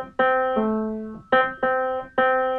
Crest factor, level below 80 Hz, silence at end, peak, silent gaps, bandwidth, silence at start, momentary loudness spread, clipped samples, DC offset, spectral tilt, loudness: 16 dB; -54 dBFS; 0 s; -8 dBFS; none; 4.3 kHz; 0 s; 7 LU; under 0.1%; under 0.1%; -7.5 dB/octave; -22 LUFS